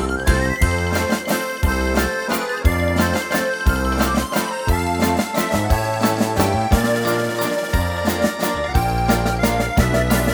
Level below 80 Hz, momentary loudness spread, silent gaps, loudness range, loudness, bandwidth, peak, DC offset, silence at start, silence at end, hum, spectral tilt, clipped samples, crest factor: -26 dBFS; 3 LU; none; 1 LU; -19 LUFS; over 20 kHz; -2 dBFS; under 0.1%; 0 s; 0 s; none; -5 dB/octave; under 0.1%; 16 dB